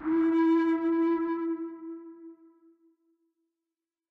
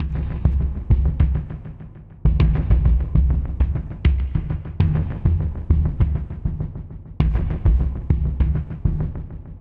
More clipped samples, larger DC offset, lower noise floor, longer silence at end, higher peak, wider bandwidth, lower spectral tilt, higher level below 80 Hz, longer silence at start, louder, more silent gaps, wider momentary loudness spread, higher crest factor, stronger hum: neither; neither; first, -90 dBFS vs -39 dBFS; first, 1.75 s vs 0 s; second, -18 dBFS vs -4 dBFS; about the same, 4.5 kHz vs 4.1 kHz; second, -7 dB/octave vs -11 dB/octave; second, -74 dBFS vs -22 dBFS; about the same, 0 s vs 0 s; second, -27 LUFS vs -22 LUFS; neither; first, 19 LU vs 12 LU; about the same, 12 dB vs 16 dB; neither